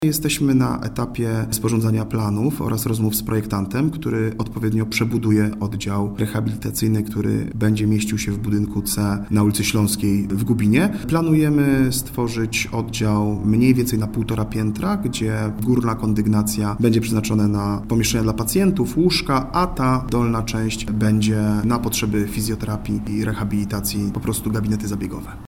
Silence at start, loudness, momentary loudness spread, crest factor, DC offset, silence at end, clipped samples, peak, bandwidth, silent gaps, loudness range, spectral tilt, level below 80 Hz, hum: 0 s; -20 LUFS; 6 LU; 18 dB; under 0.1%; 0 s; under 0.1%; -2 dBFS; 17.5 kHz; none; 3 LU; -5.5 dB/octave; -38 dBFS; none